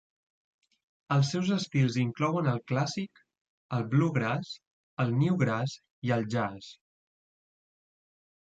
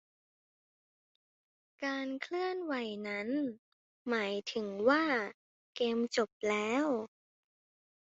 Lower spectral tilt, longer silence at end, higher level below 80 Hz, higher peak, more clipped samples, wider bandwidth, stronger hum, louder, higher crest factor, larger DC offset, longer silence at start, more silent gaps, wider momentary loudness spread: first, -6.5 dB/octave vs -2.5 dB/octave; first, 1.85 s vs 0.95 s; first, -68 dBFS vs -80 dBFS; first, -12 dBFS vs -16 dBFS; neither; about the same, 8 kHz vs 7.6 kHz; neither; first, -30 LUFS vs -34 LUFS; about the same, 18 dB vs 22 dB; neither; second, 1.1 s vs 1.8 s; second, 3.41-3.69 s, 4.67-4.97 s, 5.90-6.02 s vs 3.59-4.05 s, 5.34-5.73 s, 6.32-6.40 s; first, 13 LU vs 10 LU